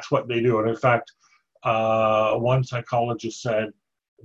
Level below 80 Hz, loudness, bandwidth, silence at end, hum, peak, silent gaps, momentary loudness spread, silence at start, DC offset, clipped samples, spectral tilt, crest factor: -58 dBFS; -23 LUFS; 8 kHz; 0.55 s; none; -6 dBFS; none; 7 LU; 0 s; under 0.1%; under 0.1%; -6.5 dB/octave; 18 dB